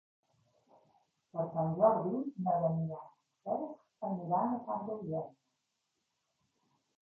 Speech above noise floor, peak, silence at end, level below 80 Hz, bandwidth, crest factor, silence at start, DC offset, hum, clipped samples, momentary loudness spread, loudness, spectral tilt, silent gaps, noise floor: 50 dB; -14 dBFS; 1.7 s; -76 dBFS; 2.4 kHz; 24 dB; 1.35 s; under 0.1%; none; under 0.1%; 16 LU; -35 LUFS; -11.5 dB/octave; none; -84 dBFS